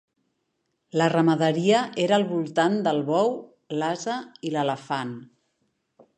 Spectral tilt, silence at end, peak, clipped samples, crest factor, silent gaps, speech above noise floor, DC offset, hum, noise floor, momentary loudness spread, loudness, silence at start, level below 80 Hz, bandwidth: -5.5 dB/octave; 0.95 s; -6 dBFS; under 0.1%; 18 dB; none; 52 dB; under 0.1%; none; -76 dBFS; 11 LU; -24 LUFS; 0.95 s; -76 dBFS; 9.8 kHz